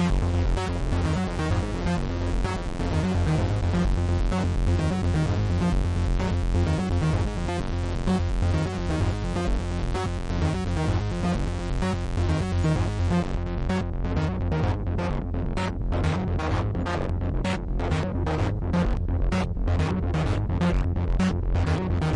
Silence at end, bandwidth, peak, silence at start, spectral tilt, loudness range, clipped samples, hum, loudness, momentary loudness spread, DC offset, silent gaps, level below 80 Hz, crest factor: 0 s; 11 kHz; -14 dBFS; 0 s; -7 dB/octave; 2 LU; under 0.1%; none; -26 LUFS; 4 LU; under 0.1%; none; -30 dBFS; 10 dB